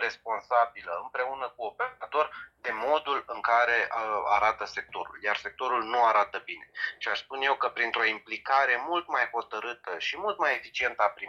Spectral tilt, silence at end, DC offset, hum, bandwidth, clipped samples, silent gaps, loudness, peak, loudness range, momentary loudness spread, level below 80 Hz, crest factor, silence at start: -2 dB/octave; 0 s; under 0.1%; none; 7.4 kHz; under 0.1%; none; -28 LUFS; -10 dBFS; 2 LU; 11 LU; -68 dBFS; 20 dB; 0 s